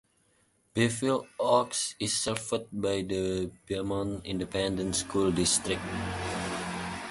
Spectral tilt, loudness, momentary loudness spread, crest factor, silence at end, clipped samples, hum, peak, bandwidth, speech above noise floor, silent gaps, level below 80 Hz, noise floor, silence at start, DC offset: -3.5 dB/octave; -30 LUFS; 9 LU; 20 dB; 0 s; under 0.1%; none; -10 dBFS; 12 kHz; 39 dB; none; -52 dBFS; -69 dBFS; 0.75 s; under 0.1%